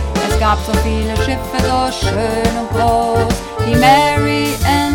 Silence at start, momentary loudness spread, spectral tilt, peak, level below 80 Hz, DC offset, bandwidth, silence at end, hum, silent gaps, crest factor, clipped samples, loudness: 0 s; 7 LU; -5 dB/octave; 0 dBFS; -24 dBFS; under 0.1%; 18.5 kHz; 0 s; none; none; 14 dB; under 0.1%; -15 LUFS